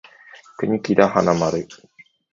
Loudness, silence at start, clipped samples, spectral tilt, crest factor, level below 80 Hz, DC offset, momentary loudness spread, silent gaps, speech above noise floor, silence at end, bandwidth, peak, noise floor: -19 LUFS; 0.6 s; under 0.1%; -6.5 dB/octave; 22 dB; -54 dBFS; under 0.1%; 12 LU; none; 28 dB; 0.6 s; 7.6 kHz; 0 dBFS; -46 dBFS